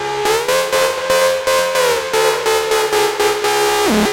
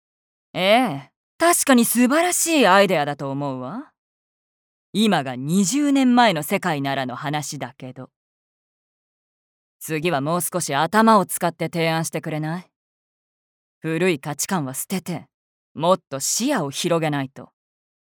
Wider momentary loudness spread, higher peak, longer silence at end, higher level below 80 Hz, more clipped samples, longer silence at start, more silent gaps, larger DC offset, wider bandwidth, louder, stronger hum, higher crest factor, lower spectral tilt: second, 2 LU vs 16 LU; about the same, -2 dBFS vs -2 dBFS; second, 0 s vs 0.65 s; first, -46 dBFS vs -72 dBFS; neither; second, 0 s vs 0.55 s; second, none vs 1.16-1.39 s, 3.98-4.93 s, 8.16-9.80 s, 12.76-13.81 s, 15.34-15.75 s; neither; second, 17 kHz vs over 20 kHz; first, -15 LUFS vs -20 LUFS; neither; second, 14 dB vs 20 dB; second, -2 dB/octave vs -4 dB/octave